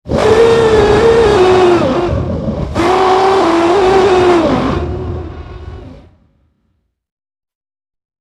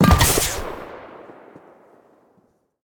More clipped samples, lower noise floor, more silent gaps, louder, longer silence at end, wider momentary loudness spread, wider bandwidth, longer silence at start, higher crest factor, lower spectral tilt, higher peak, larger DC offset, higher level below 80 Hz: neither; about the same, -63 dBFS vs -62 dBFS; neither; first, -10 LUFS vs -18 LUFS; first, 2.25 s vs 1.6 s; second, 15 LU vs 27 LU; second, 11.5 kHz vs 19 kHz; about the same, 0.05 s vs 0 s; second, 12 dB vs 18 dB; first, -6 dB/octave vs -4 dB/octave; first, 0 dBFS vs -4 dBFS; neither; about the same, -28 dBFS vs -30 dBFS